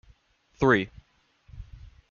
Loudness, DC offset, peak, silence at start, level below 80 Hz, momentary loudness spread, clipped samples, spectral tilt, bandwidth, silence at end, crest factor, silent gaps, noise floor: -25 LUFS; under 0.1%; -6 dBFS; 0.6 s; -50 dBFS; 26 LU; under 0.1%; -7 dB/octave; 7 kHz; 0.5 s; 24 dB; none; -62 dBFS